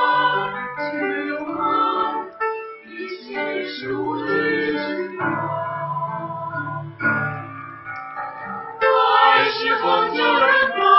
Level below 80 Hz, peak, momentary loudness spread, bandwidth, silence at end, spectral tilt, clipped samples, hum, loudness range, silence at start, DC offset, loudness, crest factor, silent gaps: -64 dBFS; -2 dBFS; 16 LU; 6 kHz; 0 s; -7 dB/octave; under 0.1%; none; 7 LU; 0 s; under 0.1%; -20 LUFS; 18 dB; none